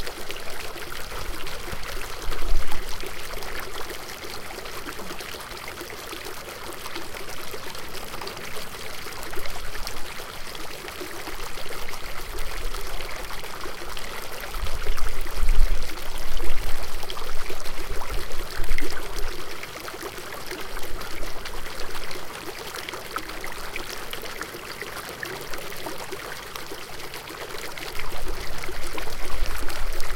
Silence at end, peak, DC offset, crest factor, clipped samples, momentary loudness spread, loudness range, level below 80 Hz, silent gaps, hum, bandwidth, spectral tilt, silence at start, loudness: 0 s; -2 dBFS; under 0.1%; 20 dB; under 0.1%; 3 LU; 3 LU; -30 dBFS; none; none; 16.5 kHz; -3 dB/octave; 0 s; -34 LUFS